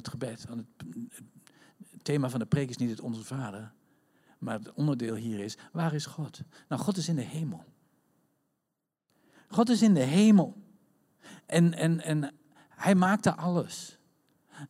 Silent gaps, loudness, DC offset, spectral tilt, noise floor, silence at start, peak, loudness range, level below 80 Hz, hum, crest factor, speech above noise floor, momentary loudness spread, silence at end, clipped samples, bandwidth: none; -29 LUFS; under 0.1%; -6.5 dB/octave; -85 dBFS; 0.05 s; -10 dBFS; 9 LU; -70 dBFS; none; 20 dB; 56 dB; 19 LU; 0.05 s; under 0.1%; 14.5 kHz